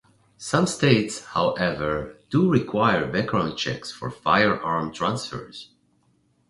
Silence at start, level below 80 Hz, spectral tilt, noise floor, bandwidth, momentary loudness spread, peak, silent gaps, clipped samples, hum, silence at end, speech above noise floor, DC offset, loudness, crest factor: 0.4 s; -52 dBFS; -5.5 dB/octave; -65 dBFS; 11.5 kHz; 13 LU; -4 dBFS; none; under 0.1%; none; 0.85 s; 42 dB; under 0.1%; -23 LUFS; 20 dB